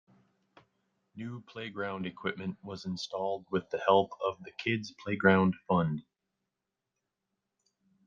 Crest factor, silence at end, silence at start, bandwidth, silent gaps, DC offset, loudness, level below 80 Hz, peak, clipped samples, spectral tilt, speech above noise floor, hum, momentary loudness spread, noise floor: 26 dB; 2.05 s; 1.15 s; 7.4 kHz; none; under 0.1%; -32 LUFS; -72 dBFS; -8 dBFS; under 0.1%; -6.5 dB/octave; 56 dB; none; 16 LU; -87 dBFS